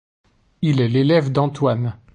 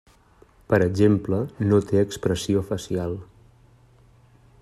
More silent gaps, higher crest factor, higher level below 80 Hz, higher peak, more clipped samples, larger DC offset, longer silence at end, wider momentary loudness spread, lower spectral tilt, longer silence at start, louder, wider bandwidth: neither; about the same, 16 dB vs 20 dB; about the same, -52 dBFS vs -52 dBFS; about the same, -4 dBFS vs -4 dBFS; neither; neither; second, 0.2 s vs 1.4 s; about the same, 7 LU vs 9 LU; about the same, -8 dB/octave vs -7 dB/octave; about the same, 0.6 s vs 0.7 s; first, -19 LUFS vs -23 LUFS; second, 9.2 kHz vs 14 kHz